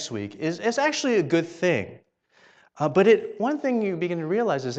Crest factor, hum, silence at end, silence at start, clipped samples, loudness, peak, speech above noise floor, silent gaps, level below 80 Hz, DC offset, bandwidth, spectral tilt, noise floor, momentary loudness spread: 16 dB; none; 0 s; 0 s; under 0.1%; -24 LUFS; -8 dBFS; 36 dB; none; -70 dBFS; under 0.1%; 8.6 kHz; -5 dB/octave; -59 dBFS; 10 LU